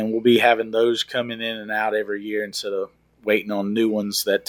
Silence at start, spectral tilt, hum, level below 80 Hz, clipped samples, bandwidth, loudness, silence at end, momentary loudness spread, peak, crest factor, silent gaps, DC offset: 0 s; -4 dB/octave; none; -66 dBFS; under 0.1%; 18 kHz; -22 LUFS; 0.1 s; 11 LU; -4 dBFS; 18 dB; none; under 0.1%